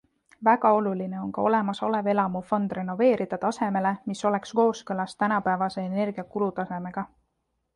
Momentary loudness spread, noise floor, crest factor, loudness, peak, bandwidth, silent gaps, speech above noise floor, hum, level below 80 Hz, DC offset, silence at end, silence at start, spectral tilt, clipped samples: 9 LU; -77 dBFS; 20 dB; -26 LUFS; -6 dBFS; 11 kHz; none; 51 dB; none; -66 dBFS; under 0.1%; 0.7 s; 0.4 s; -6.5 dB/octave; under 0.1%